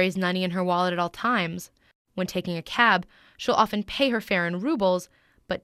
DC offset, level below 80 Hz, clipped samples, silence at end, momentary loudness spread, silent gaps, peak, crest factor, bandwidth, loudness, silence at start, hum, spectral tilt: under 0.1%; -58 dBFS; under 0.1%; 0.05 s; 11 LU; 1.95-2.05 s; -4 dBFS; 22 dB; 15.5 kHz; -25 LUFS; 0 s; none; -5 dB/octave